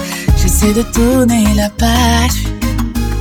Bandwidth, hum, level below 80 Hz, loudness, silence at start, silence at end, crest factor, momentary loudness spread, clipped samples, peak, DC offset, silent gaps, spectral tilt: 19 kHz; none; -16 dBFS; -12 LUFS; 0 s; 0 s; 12 dB; 7 LU; under 0.1%; 0 dBFS; under 0.1%; none; -5 dB/octave